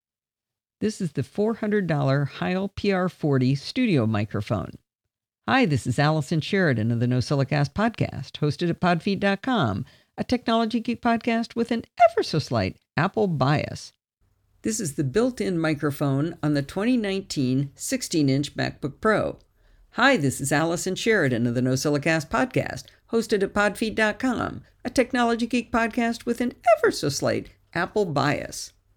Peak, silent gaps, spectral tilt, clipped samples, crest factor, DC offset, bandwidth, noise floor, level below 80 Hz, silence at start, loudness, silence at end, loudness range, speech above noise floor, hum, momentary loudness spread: -8 dBFS; none; -5.5 dB/octave; under 0.1%; 16 dB; under 0.1%; 18.5 kHz; under -90 dBFS; -54 dBFS; 0.8 s; -24 LUFS; 0.3 s; 2 LU; over 66 dB; none; 8 LU